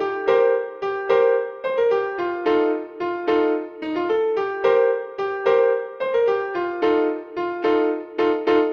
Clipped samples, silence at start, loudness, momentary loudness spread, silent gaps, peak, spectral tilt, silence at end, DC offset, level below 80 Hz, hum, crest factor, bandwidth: under 0.1%; 0 s; -21 LUFS; 8 LU; none; -6 dBFS; -6 dB/octave; 0 s; under 0.1%; -62 dBFS; none; 16 dB; 6.4 kHz